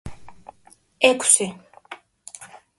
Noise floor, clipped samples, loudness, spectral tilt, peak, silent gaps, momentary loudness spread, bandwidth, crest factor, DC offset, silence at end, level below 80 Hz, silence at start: -56 dBFS; under 0.1%; -18 LUFS; -1 dB/octave; 0 dBFS; none; 26 LU; 12 kHz; 24 dB; under 0.1%; 0.25 s; -54 dBFS; 0.05 s